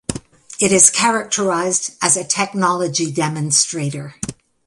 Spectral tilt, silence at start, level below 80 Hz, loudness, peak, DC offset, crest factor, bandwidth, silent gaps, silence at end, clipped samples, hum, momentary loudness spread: -2.5 dB/octave; 0.1 s; -50 dBFS; -16 LUFS; 0 dBFS; under 0.1%; 18 dB; 16 kHz; none; 0.35 s; under 0.1%; none; 18 LU